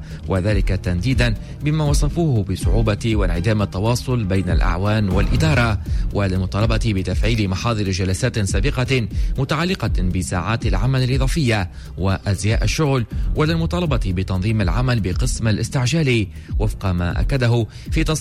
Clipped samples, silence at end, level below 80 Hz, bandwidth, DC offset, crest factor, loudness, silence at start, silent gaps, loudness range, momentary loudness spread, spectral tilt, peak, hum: under 0.1%; 0 s; -24 dBFS; 14 kHz; under 0.1%; 12 dB; -20 LUFS; 0 s; none; 1 LU; 4 LU; -6 dB/octave; -6 dBFS; none